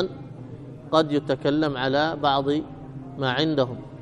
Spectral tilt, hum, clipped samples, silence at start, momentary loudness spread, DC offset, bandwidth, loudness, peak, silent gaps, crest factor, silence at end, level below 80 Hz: -6.5 dB/octave; none; under 0.1%; 0 s; 17 LU; under 0.1%; 10 kHz; -24 LUFS; -6 dBFS; none; 20 dB; 0 s; -54 dBFS